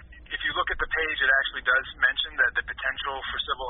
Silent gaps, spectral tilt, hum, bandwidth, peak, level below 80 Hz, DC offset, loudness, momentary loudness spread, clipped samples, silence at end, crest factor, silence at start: none; 2 dB/octave; none; 4.1 kHz; -8 dBFS; -46 dBFS; under 0.1%; -25 LUFS; 8 LU; under 0.1%; 0 s; 18 dB; 0 s